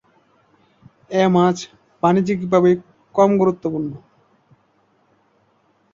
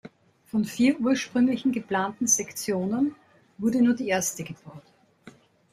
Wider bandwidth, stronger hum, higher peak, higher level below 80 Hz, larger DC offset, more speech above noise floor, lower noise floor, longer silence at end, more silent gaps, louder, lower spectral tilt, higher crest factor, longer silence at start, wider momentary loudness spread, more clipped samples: second, 7.6 kHz vs 16 kHz; neither; first, -2 dBFS vs -8 dBFS; first, -60 dBFS vs -66 dBFS; neither; first, 44 dB vs 28 dB; first, -61 dBFS vs -52 dBFS; first, 1.95 s vs 0.45 s; neither; first, -18 LUFS vs -25 LUFS; first, -7 dB/octave vs -4 dB/octave; about the same, 18 dB vs 18 dB; first, 1.1 s vs 0.05 s; first, 13 LU vs 7 LU; neither